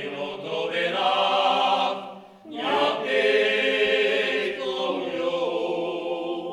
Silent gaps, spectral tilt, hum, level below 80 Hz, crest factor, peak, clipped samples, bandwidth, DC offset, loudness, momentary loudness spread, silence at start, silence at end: none; -3.5 dB/octave; none; -70 dBFS; 16 dB; -8 dBFS; under 0.1%; 12 kHz; under 0.1%; -24 LUFS; 9 LU; 0 s; 0 s